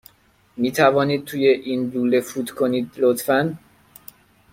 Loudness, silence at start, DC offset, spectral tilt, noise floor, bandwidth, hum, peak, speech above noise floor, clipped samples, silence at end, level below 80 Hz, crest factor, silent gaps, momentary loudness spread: -20 LUFS; 0.55 s; under 0.1%; -5.5 dB/octave; -58 dBFS; 16.5 kHz; none; -2 dBFS; 38 dB; under 0.1%; 0.95 s; -62 dBFS; 20 dB; none; 10 LU